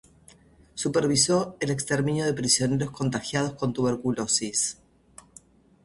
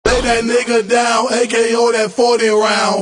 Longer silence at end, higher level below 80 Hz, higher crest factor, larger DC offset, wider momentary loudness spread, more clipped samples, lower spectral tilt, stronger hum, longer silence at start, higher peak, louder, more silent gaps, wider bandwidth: first, 1.1 s vs 0 s; second, -56 dBFS vs -34 dBFS; first, 22 dB vs 12 dB; neither; first, 7 LU vs 2 LU; neither; about the same, -4 dB/octave vs -3 dB/octave; neither; first, 0.75 s vs 0.05 s; second, -6 dBFS vs 0 dBFS; second, -25 LUFS vs -13 LUFS; neither; about the same, 11.5 kHz vs 10.5 kHz